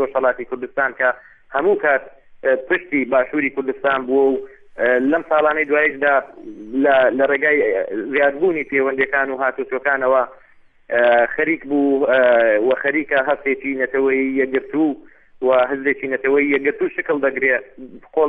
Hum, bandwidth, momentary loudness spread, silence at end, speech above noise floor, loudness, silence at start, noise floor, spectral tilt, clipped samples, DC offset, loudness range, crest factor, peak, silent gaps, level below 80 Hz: none; 3.9 kHz; 7 LU; 0 s; 30 dB; -18 LUFS; 0 s; -48 dBFS; -7.5 dB/octave; under 0.1%; under 0.1%; 3 LU; 14 dB; -4 dBFS; none; -56 dBFS